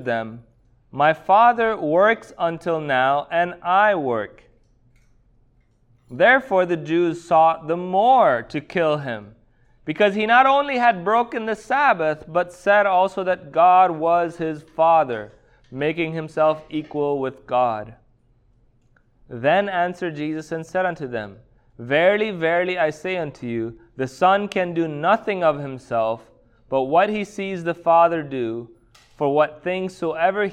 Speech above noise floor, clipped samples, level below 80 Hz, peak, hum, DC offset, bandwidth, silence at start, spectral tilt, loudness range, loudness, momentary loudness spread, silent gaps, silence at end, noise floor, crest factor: 39 dB; under 0.1%; -58 dBFS; -4 dBFS; none; under 0.1%; 10 kHz; 0 s; -6 dB/octave; 6 LU; -20 LUFS; 13 LU; none; 0 s; -59 dBFS; 18 dB